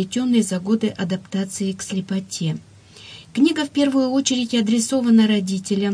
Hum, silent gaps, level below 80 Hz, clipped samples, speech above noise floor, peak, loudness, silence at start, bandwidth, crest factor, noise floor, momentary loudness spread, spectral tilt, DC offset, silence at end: none; none; -62 dBFS; under 0.1%; 23 dB; -6 dBFS; -20 LUFS; 0 s; 10.5 kHz; 14 dB; -42 dBFS; 10 LU; -5 dB/octave; under 0.1%; 0 s